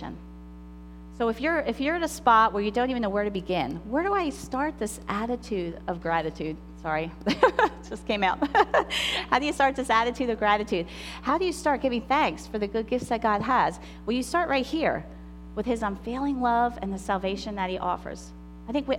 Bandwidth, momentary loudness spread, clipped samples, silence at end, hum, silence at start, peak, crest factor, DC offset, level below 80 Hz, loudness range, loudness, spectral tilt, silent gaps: 17 kHz; 14 LU; under 0.1%; 0 s; 60 Hz at -45 dBFS; 0 s; -6 dBFS; 22 dB; under 0.1%; -46 dBFS; 4 LU; -26 LUFS; -4.5 dB/octave; none